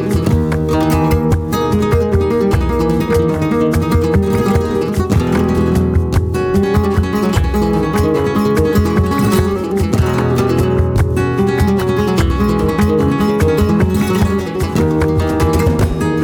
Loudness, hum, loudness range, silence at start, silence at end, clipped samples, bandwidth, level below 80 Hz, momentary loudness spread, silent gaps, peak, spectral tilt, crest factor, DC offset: -14 LUFS; none; 1 LU; 0 s; 0 s; under 0.1%; 19.5 kHz; -24 dBFS; 2 LU; none; -2 dBFS; -7.5 dB/octave; 10 dB; under 0.1%